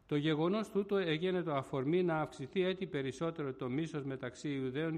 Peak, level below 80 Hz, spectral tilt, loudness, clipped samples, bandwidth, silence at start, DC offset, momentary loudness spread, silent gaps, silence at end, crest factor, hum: -22 dBFS; -70 dBFS; -7 dB/octave; -36 LUFS; under 0.1%; 11 kHz; 0.1 s; under 0.1%; 7 LU; none; 0 s; 14 dB; none